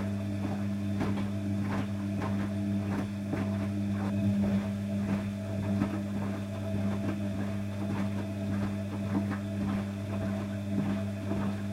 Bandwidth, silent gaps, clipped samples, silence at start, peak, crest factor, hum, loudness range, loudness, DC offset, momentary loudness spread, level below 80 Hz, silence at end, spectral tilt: 13.5 kHz; none; under 0.1%; 0 s; -16 dBFS; 16 dB; none; 2 LU; -33 LUFS; under 0.1%; 4 LU; -56 dBFS; 0 s; -8 dB/octave